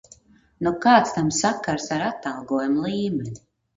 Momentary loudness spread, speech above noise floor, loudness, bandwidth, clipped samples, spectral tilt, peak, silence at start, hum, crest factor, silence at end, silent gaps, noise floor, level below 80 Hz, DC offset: 13 LU; 31 dB; -22 LUFS; 9.4 kHz; under 0.1%; -4.5 dB/octave; -2 dBFS; 0.6 s; none; 22 dB; 0.4 s; none; -53 dBFS; -56 dBFS; under 0.1%